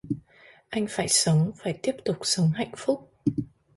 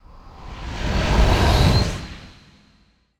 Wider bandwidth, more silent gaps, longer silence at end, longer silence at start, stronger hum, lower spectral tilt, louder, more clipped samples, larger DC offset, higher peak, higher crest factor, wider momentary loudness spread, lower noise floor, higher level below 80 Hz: second, 12 kHz vs 15.5 kHz; neither; second, 0.3 s vs 0.9 s; about the same, 0.05 s vs 0.15 s; neither; about the same, -4.5 dB/octave vs -5.5 dB/octave; second, -26 LUFS vs -19 LUFS; neither; neither; second, -8 dBFS vs -2 dBFS; about the same, 20 dB vs 18 dB; second, 12 LU vs 21 LU; second, -55 dBFS vs -59 dBFS; second, -60 dBFS vs -24 dBFS